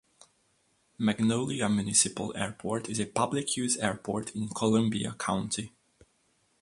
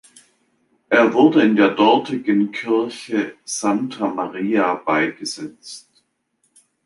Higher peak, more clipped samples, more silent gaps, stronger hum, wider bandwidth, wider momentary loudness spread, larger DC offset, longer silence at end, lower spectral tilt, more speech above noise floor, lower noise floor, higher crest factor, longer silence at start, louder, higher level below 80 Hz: second, -10 dBFS vs -2 dBFS; neither; neither; neither; about the same, 11.5 kHz vs 11.5 kHz; second, 10 LU vs 15 LU; neither; about the same, 0.95 s vs 1.05 s; about the same, -4 dB/octave vs -4.5 dB/octave; second, 41 dB vs 50 dB; about the same, -71 dBFS vs -68 dBFS; about the same, 22 dB vs 18 dB; about the same, 1 s vs 0.9 s; second, -29 LUFS vs -18 LUFS; about the same, -62 dBFS vs -66 dBFS